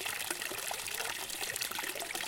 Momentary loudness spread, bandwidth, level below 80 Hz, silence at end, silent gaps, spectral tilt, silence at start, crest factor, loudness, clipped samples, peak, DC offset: 2 LU; 17 kHz; -68 dBFS; 0 s; none; 0 dB/octave; 0 s; 26 dB; -36 LUFS; under 0.1%; -14 dBFS; under 0.1%